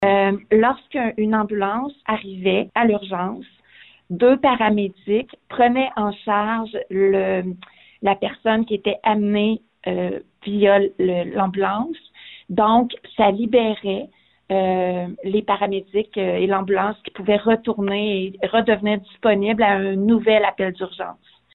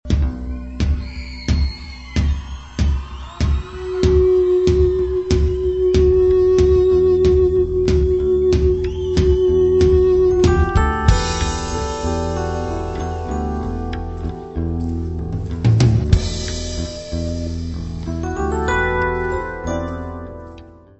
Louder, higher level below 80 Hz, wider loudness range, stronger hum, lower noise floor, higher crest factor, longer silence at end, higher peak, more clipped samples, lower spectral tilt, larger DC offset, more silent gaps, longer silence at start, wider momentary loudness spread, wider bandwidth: about the same, -20 LUFS vs -18 LUFS; second, -56 dBFS vs -24 dBFS; second, 3 LU vs 8 LU; neither; first, -50 dBFS vs -40 dBFS; about the same, 14 dB vs 18 dB; first, 0.4 s vs 0.25 s; second, -4 dBFS vs 0 dBFS; neither; first, -10 dB/octave vs -7 dB/octave; neither; neither; about the same, 0 s vs 0.05 s; second, 10 LU vs 13 LU; second, 4.2 kHz vs 8.4 kHz